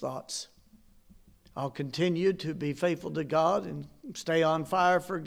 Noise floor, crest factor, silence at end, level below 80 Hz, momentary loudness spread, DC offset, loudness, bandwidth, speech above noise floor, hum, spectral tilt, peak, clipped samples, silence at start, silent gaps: -59 dBFS; 18 dB; 0 s; -64 dBFS; 14 LU; under 0.1%; -29 LUFS; 16.5 kHz; 29 dB; none; -5.5 dB/octave; -12 dBFS; under 0.1%; 0 s; none